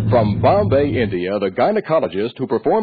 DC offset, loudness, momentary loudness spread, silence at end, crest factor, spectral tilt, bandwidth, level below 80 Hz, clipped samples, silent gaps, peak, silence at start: under 0.1%; -18 LUFS; 6 LU; 0 s; 12 dB; -10.5 dB/octave; 4.9 kHz; -42 dBFS; under 0.1%; none; -4 dBFS; 0 s